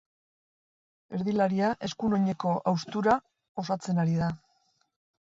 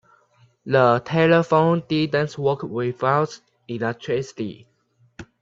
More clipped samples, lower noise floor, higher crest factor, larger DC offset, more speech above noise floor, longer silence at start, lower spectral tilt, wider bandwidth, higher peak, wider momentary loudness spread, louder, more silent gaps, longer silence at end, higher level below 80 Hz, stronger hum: neither; first, -71 dBFS vs -58 dBFS; about the same, 20 dB vs 20 dB; neither; first, 44 dB vs 38 dB; first, 1.1 s vs 0.65 s; about the same, -7 dB/octave vs -7 dB/octave; about the same, 7.8 kHz vs 7.6 kHz; second, -10 dBFS vs -2 dBFS; second, 10 LU vs 15 LU; second, -29 LUFS vs -21 LUFS; first, 3.49-3.55 s vs none; first, 0.85 s vs 0.2 s; about the same, -62 dBFS vs -60 dBFS; neither